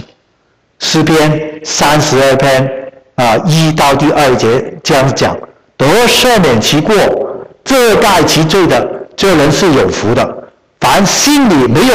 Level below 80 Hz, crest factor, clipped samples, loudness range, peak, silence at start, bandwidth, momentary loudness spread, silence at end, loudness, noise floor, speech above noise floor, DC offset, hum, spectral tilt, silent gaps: -34 dBFS; 8 dB; under 0.1%; 2 LU; -2 dBFS; 0 s; 16.5 kHz; 10 LU; 0 s; -9 LUFS; -55 dBFS; 47 dB; under 0.1%; none; -4.5 dB/octave; none